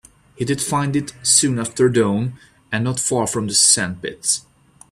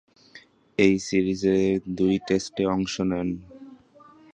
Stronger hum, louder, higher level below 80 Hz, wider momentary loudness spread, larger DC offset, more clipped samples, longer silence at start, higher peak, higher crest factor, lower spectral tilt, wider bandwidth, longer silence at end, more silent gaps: neither; first, -18 LUFS vs -24 LUFS; about the same, -54 dBFS vs -52 dBFS; about the same, 10 LU vs 8 LU; neither; neither; about the same, 0.4 s vs 0.35 s; first, 0 dBFS vs -6 dBFS; about the same, 20 dB vs 20 dB; second, -3 dB/octave vs -6 dB/octave; first, 15 kHz vs 9.4 kHz; about the same, 0.5 s vs 0.6 s; neither